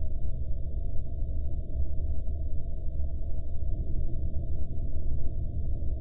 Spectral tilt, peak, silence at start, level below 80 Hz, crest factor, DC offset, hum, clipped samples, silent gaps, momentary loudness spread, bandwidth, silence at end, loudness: -13.5 dB/octave; -14 dBFS; 0 s; -30 dBFS; 10 dB; under 0.1%; none; under 0.1%; none; 2 LU; 0.7 kHz; 0 s; -36 LUFS